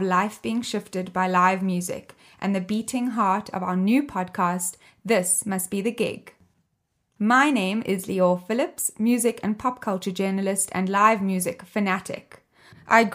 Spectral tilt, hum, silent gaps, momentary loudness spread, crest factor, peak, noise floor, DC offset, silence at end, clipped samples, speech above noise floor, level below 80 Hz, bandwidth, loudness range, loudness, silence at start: -4.5 dB/octave; none; none; 9 LU; 22 dB; -2 dBFS; -74 dBFS; under 0.1%; 0 s; under 0.1%; 50 dB; -66 dBFS; 16 kHz; 2 LU; -24 LUFS; 0 s